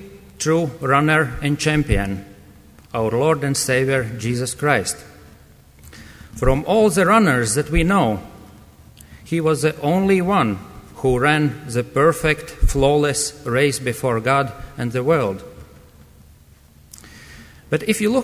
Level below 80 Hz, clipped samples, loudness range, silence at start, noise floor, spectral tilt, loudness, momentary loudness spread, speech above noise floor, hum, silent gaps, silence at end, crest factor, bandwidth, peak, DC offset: -32 dBFS; under 0.1%; 4 LU; 0 s; -48 dBFS; -5 dB/octave; -19 LUFS; 9 LU; 30 dB; none; none; 0 s; 18 dB; 16 kHz; -2 dBFS; under 0.1%